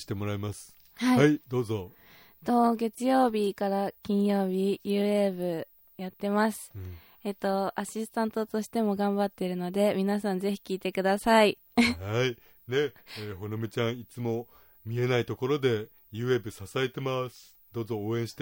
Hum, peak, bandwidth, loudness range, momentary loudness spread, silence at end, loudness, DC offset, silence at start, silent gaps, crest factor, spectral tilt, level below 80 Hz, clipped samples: none; -8 dBFS; 16.5 kHz; 5 LU; 14 LU; 0 s; -29 LUFS; under 0.1%; 0 s; none; 20 dB; -6 dB/octave; -64 dBFS; under 0.1%